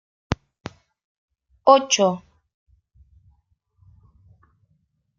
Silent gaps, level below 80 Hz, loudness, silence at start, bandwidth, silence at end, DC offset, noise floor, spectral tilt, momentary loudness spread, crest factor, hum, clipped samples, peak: 1.04-1.28 s; -52 dBFS; -20 LUFS; 0.3 s; 7.6 kHz; 3 s; under 0.1%; -68 dBFS; -3.5 dB/octave; 25 LU; 24 dB; none; under 0.1%; -2 dBFS